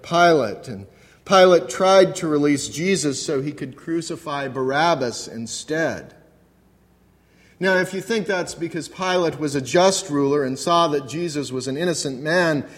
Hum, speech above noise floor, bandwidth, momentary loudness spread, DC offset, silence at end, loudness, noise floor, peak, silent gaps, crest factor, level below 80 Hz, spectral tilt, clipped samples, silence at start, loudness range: none; 36 dB; 15.5 kHz; 13 LU; under 0.1%; 0 s; -20 LUFS; -57 dBFS; -2 dBFS; none; 20 dB; -60 dBFS; -4 dB/octave; under 0.1%; 0.05 s; 7 LU